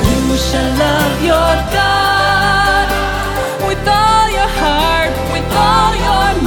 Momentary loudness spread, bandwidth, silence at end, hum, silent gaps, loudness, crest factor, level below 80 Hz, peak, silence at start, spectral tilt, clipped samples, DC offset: 5 LU; over 20 kHz; 0 s; none; none; -12 LUFS; 12 dB; -22 dBFS; 0 dBFS; 0 s; -4.5 dB/octave; under 0.1%; under 0.1%